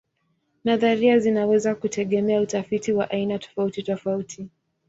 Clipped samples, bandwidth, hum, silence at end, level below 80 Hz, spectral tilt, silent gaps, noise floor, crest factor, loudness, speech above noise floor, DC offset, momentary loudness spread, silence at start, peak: under 0.1%; 8 kHz; none; 0.4 s; -62 dBFS; -5.5 dB/octave; none; -71 dBFS; 16 dB; -23 LUFS; 49 dB; under 0.1%; 11 LU; 0.65 s; -6 dBFS